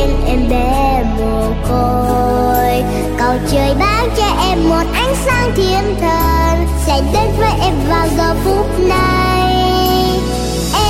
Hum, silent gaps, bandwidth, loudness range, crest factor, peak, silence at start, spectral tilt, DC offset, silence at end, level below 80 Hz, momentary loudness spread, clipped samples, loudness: none; none; 16.5 kHz; 1 LU; 10 dB; -2 dBFS; 0 s; -5.5 dB/octave; under 0.1%; 0 s; -18 dBFS; 3 LU; under 0.1%; -14 LUFS